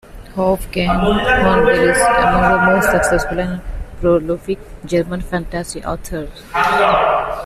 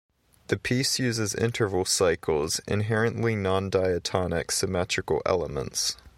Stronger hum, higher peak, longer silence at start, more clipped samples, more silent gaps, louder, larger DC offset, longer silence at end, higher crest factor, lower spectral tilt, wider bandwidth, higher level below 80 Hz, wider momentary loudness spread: neither; first, -2 dBFS vs -8 dBFS; second, 0.1 s vs 0.5 s; neither; neither; first, -15 LUFS vs -26 LUFS; neither; about the same, 0 s vs 0.1 s; about the same, 14 dB vs 18 dB; about the same, -5 dB/octave vs -4 dB/octave; second, 14.5 kHz vs 16.5 kHz; first, -30 dBFS vs -50 dBFS; first, 13 LU vs 4 LU